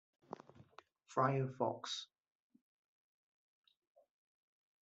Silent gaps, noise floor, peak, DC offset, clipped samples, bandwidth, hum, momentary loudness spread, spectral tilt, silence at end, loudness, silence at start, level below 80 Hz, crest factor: none; -65 dBFS; -20 dBFS; under 0.1%; under 0.1%; 8 kHz; none; 20 LU; -4.5 dB/octave; 2.75 s; -39 LUFS; 0.3 s; -86 dBFS; 24 dB